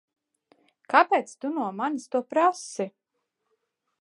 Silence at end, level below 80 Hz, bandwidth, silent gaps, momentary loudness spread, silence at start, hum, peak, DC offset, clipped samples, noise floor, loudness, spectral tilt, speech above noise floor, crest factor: 1.15 s; -86 dBFS; 11.5 kHz; none; 13 LU; 0.9 s; none; -4 dBFS; under 0.1%; under 0.1%; -80 dBFS; -26 LUFS; -4 dB/octave; 55 dB; 24 dB